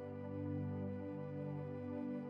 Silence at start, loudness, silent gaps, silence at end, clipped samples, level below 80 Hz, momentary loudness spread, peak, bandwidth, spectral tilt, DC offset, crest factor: 0 s; -45 LUFS; none; 0 s; under 0.1%; -86 dBFS; 3 LU; -32 dBFS; 5.2 kHz; -11 dB/octave; under 0.1%; 12 dB